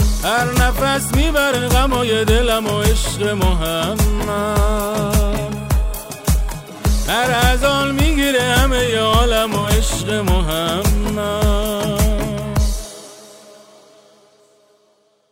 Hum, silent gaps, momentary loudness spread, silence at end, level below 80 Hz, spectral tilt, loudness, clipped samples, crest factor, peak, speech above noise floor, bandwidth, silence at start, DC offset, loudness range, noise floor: none; none; 6 LU; 1.8 s; -20 dBFS; -4.5 dB/octave; -17 LUFS; under 0.1%; 16 dB; 0 dBFS; 43 dB; 16 kHz; 0 s; under 0.1%; 6 LU; -58 dBFS